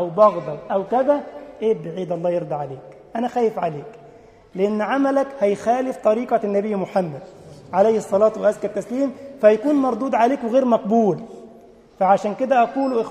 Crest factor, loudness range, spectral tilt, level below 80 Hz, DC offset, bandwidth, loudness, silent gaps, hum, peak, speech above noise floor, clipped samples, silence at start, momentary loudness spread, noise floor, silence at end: 18 dB; 5 LU; -7 dB/octave; -62 dBFS; under 0.1%; 11 kHz; -20 LUFS; none; none; -2 dBFS; 27 dB; under 0.1%; 0 s; 11 LU; -47 dBFS; 0 s